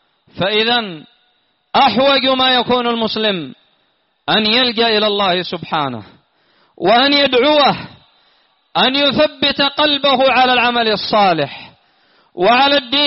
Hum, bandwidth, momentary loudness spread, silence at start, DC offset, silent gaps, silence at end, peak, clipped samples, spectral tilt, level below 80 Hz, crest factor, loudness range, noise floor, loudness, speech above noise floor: none; 6 kHz; 10 LU; 0.35 s; under 0.1%; none; 0 s; 0 dBFS; under 0.1%; -1 dB/octave; -54 dBFS; 14 dB; 3 LU; -62 dBFS; -13 LUFS; 48 dB